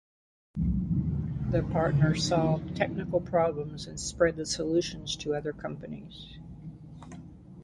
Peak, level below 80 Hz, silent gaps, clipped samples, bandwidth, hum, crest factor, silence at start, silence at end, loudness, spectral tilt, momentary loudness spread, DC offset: -10 dBFS; -44 dBFS; none; under 0.1%; 11.5 kHz; none; 20 dB; 0.55 s; 0 s; -29 LUFS; -5.5 dB/octave; 20 LU; under 0.1%